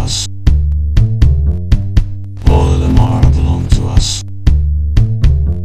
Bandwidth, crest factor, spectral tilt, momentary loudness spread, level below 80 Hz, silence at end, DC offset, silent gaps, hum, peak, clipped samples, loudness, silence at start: 10 kHz; 10 dB; -6 dB/octave; 5 LU; -12 dBFS; 0 s; 4%; none; none; 0 dBFS; 0.7%; -13 LUFS; 0 s